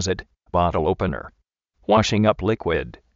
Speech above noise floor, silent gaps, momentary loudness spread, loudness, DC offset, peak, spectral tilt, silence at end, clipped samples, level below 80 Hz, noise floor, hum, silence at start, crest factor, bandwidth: 41 dB; none; 10 LU; -22 LUFS; under 0.1%; -4 dBFS; -5 dB/octave; 0.25 s; under 0.1%; -40 dBFS; -62 dBFS; none; 0 s; 18 dB; 7.6 kHz